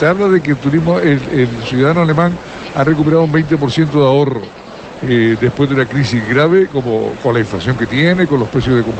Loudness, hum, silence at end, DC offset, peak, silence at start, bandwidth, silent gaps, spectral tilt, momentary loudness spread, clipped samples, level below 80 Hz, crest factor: -13 LUFS; none; 0 s; under 0.1%; -2 dBFS; 0 s; 8.6 kHz; none; -7.5 dB/octave; 6 LU; under 0.1%; -40 dBFS; 12 dB